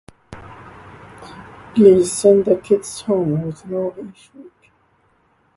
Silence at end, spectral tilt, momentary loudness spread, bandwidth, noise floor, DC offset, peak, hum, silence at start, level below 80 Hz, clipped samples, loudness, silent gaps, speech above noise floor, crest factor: 1.15 s; -6.5 dB/octave; 27 LU; 11.5 kHz; -60 dBFS; under 0.1%; 0 dBFS; none; 0.3 s; -54 dBFS; under 0.1%; -16 LUFS; none; 43 dB; 18 dB